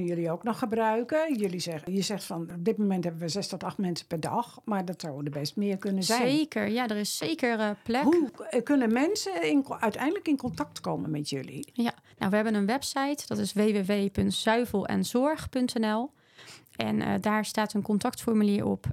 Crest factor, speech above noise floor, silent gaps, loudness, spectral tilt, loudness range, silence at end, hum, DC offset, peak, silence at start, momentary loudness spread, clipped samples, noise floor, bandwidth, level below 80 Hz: 20 dB; 23 dB; none; -29 LUFS; -5 dB/octave; 4 LU; 0 s; none; under 0.1%; -10 dBFS; 0 s; 8 LU; under 0.1%; -52 dBFS; 16 kHz; -62 dBFS